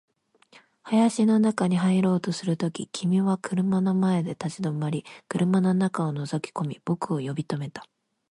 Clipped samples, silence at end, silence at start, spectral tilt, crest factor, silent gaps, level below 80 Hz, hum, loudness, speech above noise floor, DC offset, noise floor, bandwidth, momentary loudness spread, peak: under 0.1%; 0.45 s; 0.85 s; -7 dB/octave; 16 dB; none; -68 dBFS; none; -25 LUFS; 33 dB; under 0.1%; -58 dBFS; 11 kHz; 10 LU; -10 dBFS